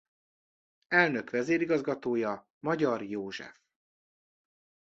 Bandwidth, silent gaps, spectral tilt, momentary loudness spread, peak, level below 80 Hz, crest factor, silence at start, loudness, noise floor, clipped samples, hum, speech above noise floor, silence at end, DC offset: 7.8 kHz; 2.50-2.61 s; -6 dB/octave; 12 LU; -10 dBFS; -76 dBFS; 22 dB; 0.9 s; -30 LUFS; under -90 dBFS; under 0.1%; none; over 60 dB; 1.35 s; under 0.1%